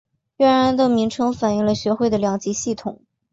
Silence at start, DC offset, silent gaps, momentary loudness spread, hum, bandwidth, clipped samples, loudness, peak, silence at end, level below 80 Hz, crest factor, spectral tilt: 0.4 s; under 0.1%; none; 9 LU; none; 8 kHz; under 0.1%; -19 LUFS; -6 dBFS; 0.4 s; -52 dBFS; 14 dB; -5 dB/octave